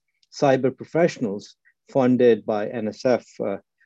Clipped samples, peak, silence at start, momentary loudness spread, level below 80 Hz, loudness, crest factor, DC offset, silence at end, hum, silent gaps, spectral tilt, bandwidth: under 0.1%; -6 dBFS; 0.35 s; 12 LU; -68 dBFS; -22 LUFS; 16 dB; under 0.1%; 0.25 s; none; none; -6.5 dB/octave; 7.8 kHz